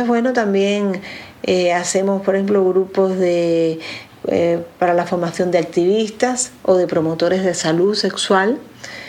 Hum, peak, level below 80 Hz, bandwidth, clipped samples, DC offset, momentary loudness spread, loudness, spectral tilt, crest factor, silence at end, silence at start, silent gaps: none; -2 dBFS; -58 dBFS; 13 kHz; under 0.1%; under 0.1%; 6 LU; -17 LUFS; -4.5 dB/octave; 16 dB; 0 s; 0 s; none